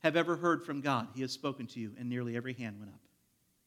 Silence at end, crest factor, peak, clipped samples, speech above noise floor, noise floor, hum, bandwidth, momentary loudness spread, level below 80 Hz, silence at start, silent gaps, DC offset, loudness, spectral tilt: 0.7 s; 22 dB; -14 dBFS; under 0.1%; 39 dB; -74 dBFS; none; 15.5 kHz; 12 LU; -84 dBFS; 0.05 s; none; under 0.1%; -36 LUFS; -5.5 dB/octave